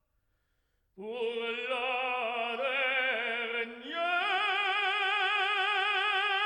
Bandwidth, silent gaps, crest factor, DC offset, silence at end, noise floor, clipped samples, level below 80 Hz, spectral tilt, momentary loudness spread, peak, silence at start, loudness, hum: 12 kHz; none; 14 dB; under 0.1%; 0 s; -76 dBFS; under 0.1%; -78 dBFS; -1.5 dB/octave; 7 LU; -18 dBFS; 0.95 s; -30 LUFS; none